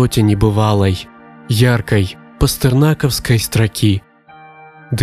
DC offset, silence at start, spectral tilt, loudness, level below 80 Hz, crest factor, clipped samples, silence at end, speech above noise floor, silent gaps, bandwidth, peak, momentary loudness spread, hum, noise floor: under 0.1%; 0 s; -6 dB/octave; -15 LUFS; -32 dBFS; 14 dB; under 0.1%; 0 s; 28 dB; none; 15.5 kHz; 0 dBFS; 9 LU; none; -41 dBFS